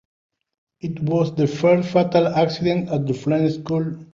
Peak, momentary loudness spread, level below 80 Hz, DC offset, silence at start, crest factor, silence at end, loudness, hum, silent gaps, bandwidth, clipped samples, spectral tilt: -4 dBFS; 7 LU; -56 dBFS; under 0.1%; 0.85 s; 16 dB; 0.1 s; -20 LUFS; none; none; 7.4 kHz; under 0.1%; -7.5 dB/octave